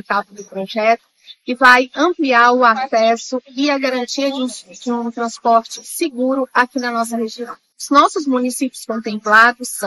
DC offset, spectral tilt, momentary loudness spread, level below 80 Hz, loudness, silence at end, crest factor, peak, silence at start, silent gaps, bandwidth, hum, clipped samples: under 0.1%; -2.5 dB/octave; 15 LU; -64 dBFS; -16 LUFS; 0 s; 16 dB; 0 dBFS; 0.1 s; none; 13 kHz; none; 0.2%